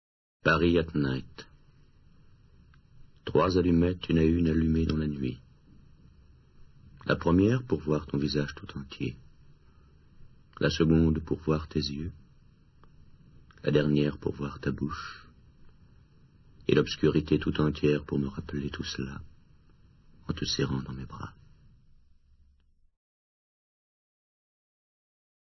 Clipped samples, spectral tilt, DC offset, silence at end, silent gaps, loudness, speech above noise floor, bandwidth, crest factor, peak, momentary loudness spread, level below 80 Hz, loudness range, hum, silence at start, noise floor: under 0.1%; -7 dB/octave; under 0.1%; 4.2 s; none; -28 LUFS; 36 dB; 6.2 kHz; 22 dB; -8 dBFS; 16 LU; -46 dBFS; 9 LU; none; 0.45 s; -64 dBFS